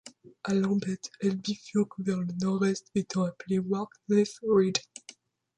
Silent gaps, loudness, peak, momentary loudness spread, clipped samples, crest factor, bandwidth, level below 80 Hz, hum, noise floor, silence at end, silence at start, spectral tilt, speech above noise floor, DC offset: none; -29 LUFS; -10 dBFS; 8 LU; under 0.1%; 20 dB; 9.8 kHz; -70 dBFS; none; -55 dBFS; 0.45 s; 0.05 s; -6 dB/octave; 26 dB; under 0.1%